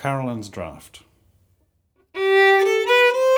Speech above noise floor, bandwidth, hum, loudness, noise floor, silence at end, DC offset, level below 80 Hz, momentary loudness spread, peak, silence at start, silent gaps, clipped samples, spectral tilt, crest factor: 37 dB; over 20 kHz; none; -17 LUFS; -65 dBFS; 0 s; under 0.1%; -58 dBFS; 20 LU; -6 dBFS; 0 s; none; under 0.1%; -4.5 dB/octave; 16 dB